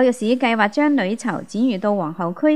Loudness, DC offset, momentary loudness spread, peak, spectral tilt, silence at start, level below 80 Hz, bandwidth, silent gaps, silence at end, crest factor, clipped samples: -20 LUFS; 0.4%; 7 LU; -2 dBFS; -5.5 dB/octave; 0 s; -70 dBFS; 12 kHz; none; 0 s; 16 dB; under 0.1%